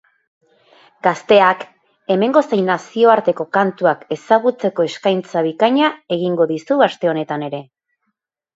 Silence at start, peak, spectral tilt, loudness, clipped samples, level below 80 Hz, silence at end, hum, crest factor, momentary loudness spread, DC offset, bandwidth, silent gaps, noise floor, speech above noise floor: 1.05 s; 0 dBFS; -6 dB/octave; -16 LUFS; under 0.1%; -66 dBFS; 0.95 s; none; 18 dB; 11 LU; under 0.1%; 8 kHz; none; -74 dBFS; 58 dB